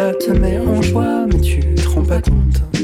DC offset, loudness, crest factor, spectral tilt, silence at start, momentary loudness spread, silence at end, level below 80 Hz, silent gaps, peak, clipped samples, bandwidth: under 0.1%; -16 LUFS; 8 dB; -7 dB/octave; 0 s; 1 LU; 0 s; -16 dBFS; none; -6 dBFS; under 0.1%; 14.5 kHz